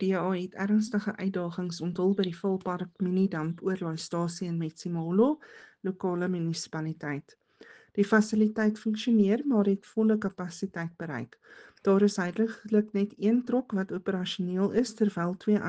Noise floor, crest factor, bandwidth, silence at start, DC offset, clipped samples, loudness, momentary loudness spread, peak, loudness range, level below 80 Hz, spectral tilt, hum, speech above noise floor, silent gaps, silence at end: -55 dBFS; 18 dB; 9.2 kHz; 0 s; under 0.1%; under 0.1%; -29 LUFS; 11 LU; -10 dBFS; 4 LU; -70 dBFS; -6.5 dB/octave; none; 27 dB; none; 0 s